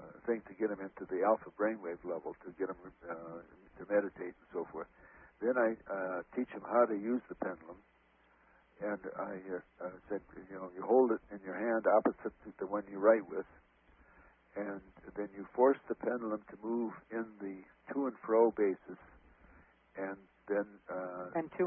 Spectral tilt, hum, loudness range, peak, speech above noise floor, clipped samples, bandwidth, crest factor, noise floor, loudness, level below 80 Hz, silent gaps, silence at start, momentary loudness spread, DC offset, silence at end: -1.5 dB/octave; none; 7 LU; -14 dBFS; 33 dB; under 0.1%; 3.4 kHz; 22 dB; -69 dBFS; -36 LUFS; -72 dBFS; none; 0 s; 17 LU; under 0.1%; 0 s